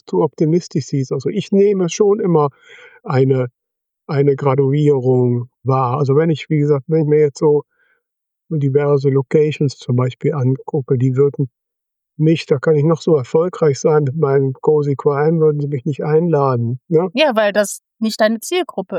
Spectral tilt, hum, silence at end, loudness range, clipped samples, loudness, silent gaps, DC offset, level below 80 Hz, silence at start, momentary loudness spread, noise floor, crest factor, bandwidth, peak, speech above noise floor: -7 dB/octave; none; 0 s; 2 LU; under 0.1%; -16 LUFS; none; under 0.1%; -66 dBFS; 0.1 s; 7 LU; -80 dBFS; 14 dB; 14 kHz; -2 dBFS; 64 dB